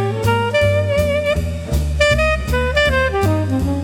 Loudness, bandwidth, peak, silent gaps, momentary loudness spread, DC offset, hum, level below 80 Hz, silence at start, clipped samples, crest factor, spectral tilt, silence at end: -17 LUFS; 17.5 kHz; -2 dBFS; none; 6 LU; under 0.1%; none; -26 dBFS; 0 s; under 0.1%; 14 dB; -5.5 dB/octave; 0 s